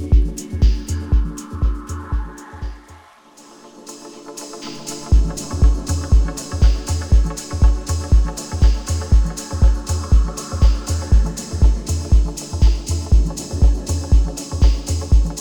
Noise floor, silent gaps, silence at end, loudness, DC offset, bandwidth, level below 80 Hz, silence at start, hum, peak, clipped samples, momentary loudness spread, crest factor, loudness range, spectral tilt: -45 dBFS; none; 0 s; -19 LUFS; under 0.1%; 12 kHz; -18 dBFS; 0 s; none; -2 dBFS; under 0.1%; 13 LU; 14 dB; 8 LU; -5.5 dB/octave